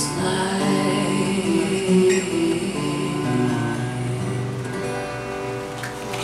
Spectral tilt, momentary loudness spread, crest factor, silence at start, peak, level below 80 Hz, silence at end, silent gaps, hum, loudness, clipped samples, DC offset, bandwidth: -5.5 dB/octave; 9 LU; 16 dB; 0 s; -6 dBFS; -50 dBFS; 0 s; none; none; -22 LUFS; under 0.1%; under 0.1%; 14 kHz